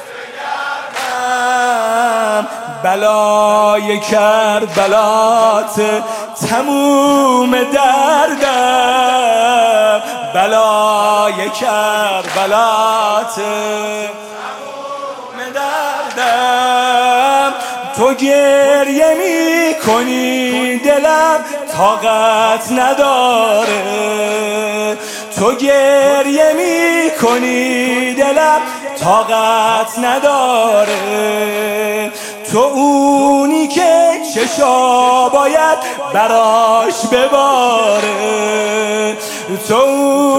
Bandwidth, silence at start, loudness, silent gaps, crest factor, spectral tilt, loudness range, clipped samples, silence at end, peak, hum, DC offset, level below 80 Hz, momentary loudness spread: 16.5 kHz; 0 s; -12 LUFS; none; 12 dB; -3 dB/octave; 3 LU; under 0.1%; 0 s; 0 dBFS; none; under 0.1%; -56 dBFS; 9 LU